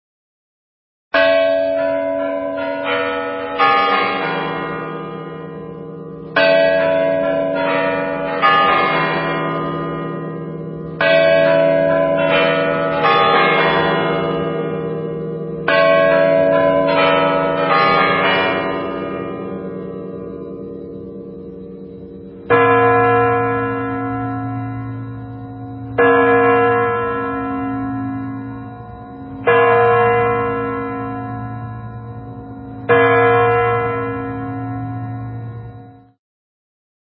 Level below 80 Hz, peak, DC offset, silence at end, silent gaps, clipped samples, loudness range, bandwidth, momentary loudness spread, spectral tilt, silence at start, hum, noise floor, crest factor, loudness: -46 dBFS; 0 dBFS; under 0.1%; 1.25 s; none; under 0.1%; 5 LU; 5.6 kHz; 19 LU; -11 dB/octave; 1.15 s; none; -39 dBFS; 16 dB; -16 LUFS